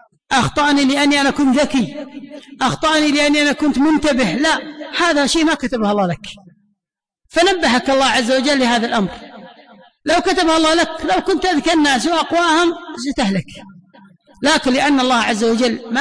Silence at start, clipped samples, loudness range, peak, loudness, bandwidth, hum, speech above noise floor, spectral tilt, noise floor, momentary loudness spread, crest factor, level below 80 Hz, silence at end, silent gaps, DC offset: 0.3 s; under 0.1%; 2 LU; -6 dBFS; -15 LUFS; 10.5 kHz; none; 69 dB; -3.5 dB/octave; -84 dBFS; 10 LU; 10 dB; -44 dBFS; 0 s; none; under 0.1%